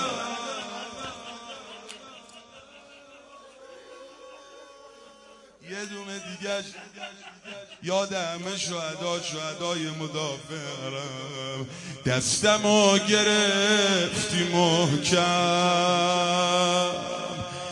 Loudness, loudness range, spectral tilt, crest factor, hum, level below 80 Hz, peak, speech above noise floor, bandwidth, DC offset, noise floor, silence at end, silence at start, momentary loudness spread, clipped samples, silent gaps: -25 LUFS; 21 LU; -3 dB/octave; 20 dB; none; -64 dBFS; -6 dBFS; 27 dB; 11.5 kHz; under 0.1%; -52 dBFS; 0 s; 0 s; 21 LU; under 0.1%; none